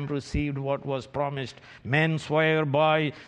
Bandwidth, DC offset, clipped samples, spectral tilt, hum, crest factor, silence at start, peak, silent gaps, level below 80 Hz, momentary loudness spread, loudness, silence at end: 9.4 kHz; under 0.1%; under 0.1%; -6.5 dB/octave; none; 18 dB; 0 s; -8 dBFS; none; -46 dBFS; 10 LU; -26 LUFS; 0 s